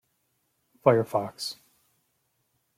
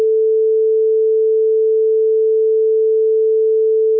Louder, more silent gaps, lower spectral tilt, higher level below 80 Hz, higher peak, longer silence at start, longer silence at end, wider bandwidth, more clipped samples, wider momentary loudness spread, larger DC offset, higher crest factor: second, -26 LUFS vs -14 LUFS; neither; second, -5.5 dB/octave vs -10 dB/octave; first, -72 dBFS vs under -90 dBFS; first, -6 dBFS vs -10 dBFS; first, 0.85 s vs 0 s; first, 1.25 s vs 0 s; first, 16 kHz vs 0.5 kHz; neither; first, 13 LU vs 0 LU; neither; first, 24 dB vs 4 dB